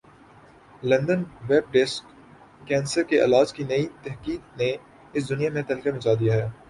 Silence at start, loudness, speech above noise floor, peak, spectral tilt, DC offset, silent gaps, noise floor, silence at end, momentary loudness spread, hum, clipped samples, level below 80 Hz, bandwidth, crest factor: 0.8 s; -24 LUFS; 28 dB; -6 dBFS; -6 dB/octave; under 0.1%; none; -51 dBFS; 0.15 s; 12 LU; none; under 0.1%; -56 dBFS; 11.5 kHz; 18 dB